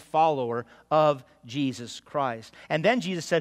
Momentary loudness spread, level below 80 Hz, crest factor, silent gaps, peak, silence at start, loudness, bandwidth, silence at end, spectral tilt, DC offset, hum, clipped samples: 12 LU; -70 dBFS; 18 dB; none; -10 dBFS; 0 s; -27 LUFS; 14.5 kHz; 0 s; -5.5 dB/octave; under 0.1%; none; under 0.1%